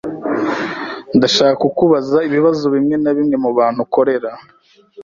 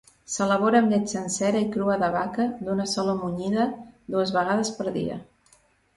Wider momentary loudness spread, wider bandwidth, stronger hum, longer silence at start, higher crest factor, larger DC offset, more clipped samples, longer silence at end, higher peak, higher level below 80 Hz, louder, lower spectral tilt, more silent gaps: about the same, 9 LU vs 10 LU; second, 7.6 kHz vs 11.5 kHz; neither; second, 0.05 s vs 0.3 s; about the same, 14 dB vs 18 dB; neither; neither; second, 0 s vs 0.75 s; first, 0 dBFS vs -6 dBFS; first, -54 dBFS vs -60 dBFS; first, -15 LUFS vs -25 LUFS; about the same, -5.5 dB/octave vs -5 dB/octave; neither